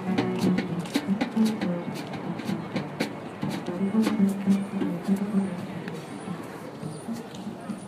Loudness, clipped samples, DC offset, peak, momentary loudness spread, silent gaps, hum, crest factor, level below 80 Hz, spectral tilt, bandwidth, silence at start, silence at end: -29 LUFS; under 0.1%; under 0.1%; -10 dBFS; 12 LU; none; none; 18 dB; -64 dBFS; -6.5 dB/octave; 15 kHz; 0 s; 0 s